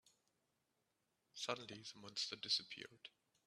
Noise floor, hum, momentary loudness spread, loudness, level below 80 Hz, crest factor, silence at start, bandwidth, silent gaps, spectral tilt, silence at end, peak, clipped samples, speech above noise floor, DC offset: -86 dBFS; none; 19 LU; -45 LUFS; under -90 dBFS; 26 dB; 1.35 s; 13.5 kHz; none; -1.5 dB/octave; 0.35 s; -24 dBFS; under 0.1%; 39 dB; under 0.1%